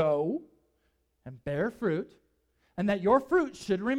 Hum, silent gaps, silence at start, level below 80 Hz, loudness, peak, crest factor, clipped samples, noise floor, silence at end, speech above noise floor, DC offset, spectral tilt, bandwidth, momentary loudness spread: none; none; 0 s; -60 dBFS; -29 LUFS; -12 dBFS; 18 dB; under 0.1%; -74 dBFS; 0 s; 45 dB; under 0.1%; -7 dB/octave; 12.5 kHz; 18 LU